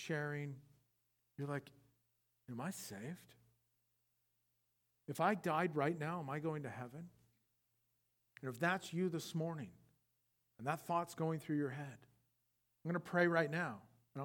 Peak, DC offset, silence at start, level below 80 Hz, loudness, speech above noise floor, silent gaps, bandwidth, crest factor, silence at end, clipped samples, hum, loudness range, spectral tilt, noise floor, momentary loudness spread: -20 dBFS; under 0.1%; 0 s; -86 dBFS; -41 LUFS; 43 dB; none; 18.5 kHz; 22 dB; 0 s; under 0.1%; none; 10 LU; -6 dB/octave; -83 dBFS; 17 LU